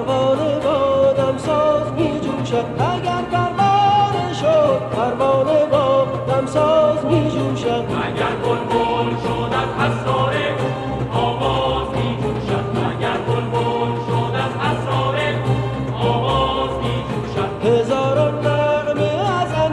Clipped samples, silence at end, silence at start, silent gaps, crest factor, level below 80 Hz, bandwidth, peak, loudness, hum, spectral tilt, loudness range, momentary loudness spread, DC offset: under 0.1%; 0 s; 0 s; none; 14 dB; -40 dBFS; 11 kHz; -4 dBFS; -18 LUFS; none; -6.5 dB/octave; 4 LU; 6 LU; under 0.1%